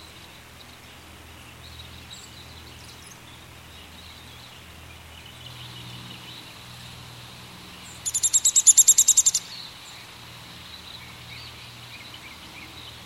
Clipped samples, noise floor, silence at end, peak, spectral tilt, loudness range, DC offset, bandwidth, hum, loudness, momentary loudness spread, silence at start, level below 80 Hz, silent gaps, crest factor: under 0.1%; -46 dBFS; 0.15 s; -2 dBFS; 0.5 dB/octave; 24 LU; under 0.1%; 16.5 kHz; none; -16 LUFS; 29 LU; 1.8 s; -58 dBFS; none; 26 dB